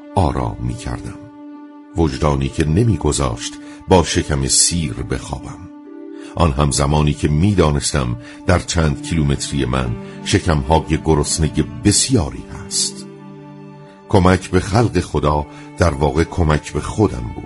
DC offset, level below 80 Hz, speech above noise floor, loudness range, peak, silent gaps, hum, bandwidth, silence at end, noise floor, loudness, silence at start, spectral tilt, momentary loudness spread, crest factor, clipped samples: under 0.1%; -28 dBFS; 21 dB; 2 LU; 0 dBFS; none; none; 11.5 kHz; 0 s; -38 dBFS; -17 LUFS; 0 s; -5 dB/octave; 19 LU; 18 dB; under 0.1%